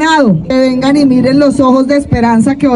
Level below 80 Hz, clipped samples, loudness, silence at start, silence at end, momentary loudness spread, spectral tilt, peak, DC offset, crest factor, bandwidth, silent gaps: -34 dBFS; under 0.1%; -9 LUFS; 0 s; 0 s; 2 LU; -6.5 dB/octave; 0 dBFS; under 0.1%; 8 dB; 11 kHz; none